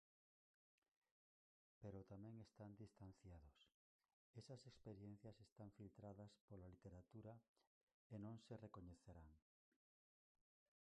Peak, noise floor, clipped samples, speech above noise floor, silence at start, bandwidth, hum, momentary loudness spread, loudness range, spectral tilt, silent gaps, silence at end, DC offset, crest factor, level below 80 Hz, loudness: -46 dBFS; under -90 dBFS; under 0.1%; over 28 dB; 1.8 s; 9.6 kHz; none; 7 LU; 2 LU; -7.5 dB/octave; 3.74-3.99 s, 4.13-4.34 s, 5.52-5.56 s, 6.41-6.48 s, 7.48-7.55 s, 7.67-7.87 s, 7.94-8.10 s; 1.55 s; under 0.1%; 18 dB; -78 dBFS; -63 LUFS